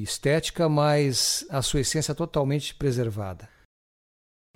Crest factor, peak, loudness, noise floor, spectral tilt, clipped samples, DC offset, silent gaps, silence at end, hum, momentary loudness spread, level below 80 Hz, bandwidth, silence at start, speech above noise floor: 14 dB; -12 dBFS; -25 LUFS; under -90 dBFS; -4.5 dB/octave; under 0.1%; under 0.1%; none; 1.1 s; none; 8 LU; -46 dBFS; 16.5 kHz; 0 s; over 65 dB